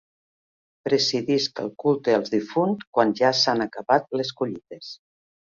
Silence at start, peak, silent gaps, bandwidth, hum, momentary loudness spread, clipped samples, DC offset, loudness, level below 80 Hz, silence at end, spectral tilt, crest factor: 0.85 s; -4 dBFS; 2.87-2.93 s; 7.6 kHz; none; 13 LU; under 0.1%; under 0.1%; -23 LUFS; -68 dBFS; 0.65 s; -4.5 dB/octave; 20 dB